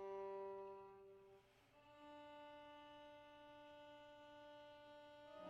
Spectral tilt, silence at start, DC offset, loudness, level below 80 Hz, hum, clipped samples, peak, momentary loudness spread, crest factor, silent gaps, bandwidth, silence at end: -5 dB/octave; 0 s; under 0.1%; -59 LUFS; -86 dBFS; none; under 0.1%; -42 dBFS; 13 LU; 16 dB; none; 8.2 kHz; 0 s